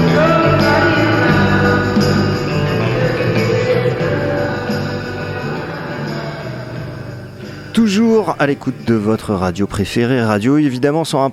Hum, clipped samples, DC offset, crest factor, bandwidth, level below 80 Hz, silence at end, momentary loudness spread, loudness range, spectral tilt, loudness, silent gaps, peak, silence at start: none; under 0.1%; under 0.1%; 14 dB; 14.5 kHz; -38 dBFS; 0 s; 13 LU; 8 LU; -6.5 dB/octave; -15 LUFS; none; -2 dBFS; 0 s